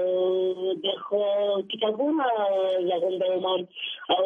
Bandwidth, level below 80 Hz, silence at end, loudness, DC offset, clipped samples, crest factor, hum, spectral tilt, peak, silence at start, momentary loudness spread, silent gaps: 3.9 kHz; -78 dBFS; 0 s; -26 LUFS; under 0.1%; under 0.1%; 16 dB; none; -6.5 dB/octave; -10 dBFS; 0 s; 4 LU; none